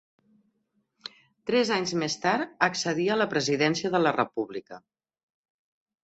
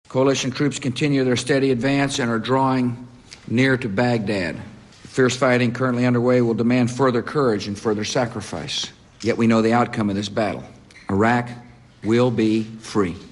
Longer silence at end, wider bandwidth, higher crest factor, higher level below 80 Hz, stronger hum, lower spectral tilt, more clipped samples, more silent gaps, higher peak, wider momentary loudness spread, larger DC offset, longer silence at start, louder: first, 1.25 s vs 0 s; second, 8.2 kHz vs 11.5 kHz; first, 24 dB vs 14 dB; second, -70 dBFS vs -50 dBFS; neither; second, -4 dB/octave vs -5.5 dB/octave; neither; neither; about the same, -4 dBFS vs -6 dBFS; first, 16 LU vs 11 LU; neither; first, 1.45 s vs 0.1 s; second, -26 LUFS vs -20 LUFS